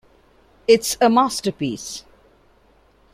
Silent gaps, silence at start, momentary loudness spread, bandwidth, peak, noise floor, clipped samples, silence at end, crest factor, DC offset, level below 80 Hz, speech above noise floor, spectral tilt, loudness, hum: none; 0.7 s; 15 LU; 16 kHz; -2 dBFS; -56 dBFS; under 0.1%; 1.15 s; 20 dB; under 0.1%; -56 dBFS; 38 dB; -3.5 dB/octave; -19 LUFS; none